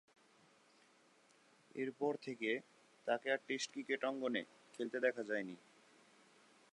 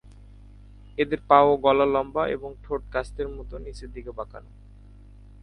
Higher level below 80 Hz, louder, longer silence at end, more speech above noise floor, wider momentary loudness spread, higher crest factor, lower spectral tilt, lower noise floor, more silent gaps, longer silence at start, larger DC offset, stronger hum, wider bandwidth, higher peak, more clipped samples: second, under -90 dBFS vs -44 dBFS; second, -41 LUFS vs -23 LUFS; first, 1.15 s vs 1 s; first, 30 dB vs 23 dB; second, 10 LU vs 21 LU; about the same, 22 dB vs 24 dB; second, -3.5 dB/octave vs -6.5 dB/octave; first, -70 dBFS vs -47 dBFS; neither; first, 1.75 s vs 0.05 s; neither; second, none vs 50 Hz at -45 dBFS; about the same, 11 kHz vs 10.5 kHz; second, -22 dBFS vs -2 dBFS; neither